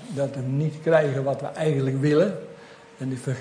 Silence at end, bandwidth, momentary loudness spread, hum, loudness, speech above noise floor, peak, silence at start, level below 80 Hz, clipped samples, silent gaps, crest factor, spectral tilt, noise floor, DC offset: 0 s; 10.5 kHz; 12 LU; none; -24 LUFS; 22 dB; -6 dBFS; 0 s; -66 dBFS; under 0.1%; none; 18 dB; -7.5 dB/octave; -46 dBFS; under 0.1%